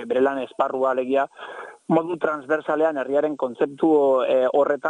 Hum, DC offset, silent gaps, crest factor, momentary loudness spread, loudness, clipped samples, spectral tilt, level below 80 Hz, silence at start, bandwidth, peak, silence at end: none; under 0.1%; none; 14 dB; 7 LU; -22 LUFS; under 0.1%; -7 dB/octave; -68 dBFS; 0 s; 9.8 kHz; -8 dBFS; 0 s